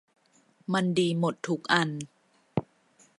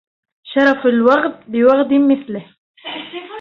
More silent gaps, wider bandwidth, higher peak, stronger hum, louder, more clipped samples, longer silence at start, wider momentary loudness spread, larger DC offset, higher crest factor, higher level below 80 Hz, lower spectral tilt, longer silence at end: second, none vs 2.58-2.74 s; first, 11.5 kHz vs 6.4 kHz; second, -6 dBFS vs 0 dBFS; neither; second, -28 LUFS vs -14 LUFS; neither; first, 0.7 s vs 0.45 s; second, 14 LU vs 17 LU; neither; first, 24 dB vs 14 dB; second, -68 dBFS vs -60 dBFS; about the same, -5.5 dB/octave vs -6.5 dB/octave; first, 0.6 s vs 0 s